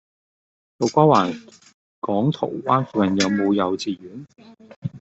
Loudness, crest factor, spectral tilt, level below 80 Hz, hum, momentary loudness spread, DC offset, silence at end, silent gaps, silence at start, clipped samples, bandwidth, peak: -20 LUFS; 20 dB; -6 dB/octave; -62 dBFS; none; 18 LU; under 0.1%; 0 s; 1.74-2.02 s, 4.76-4.82 s; 0.8 s; under 0.1%; 8.2 kHz; -2 dBFS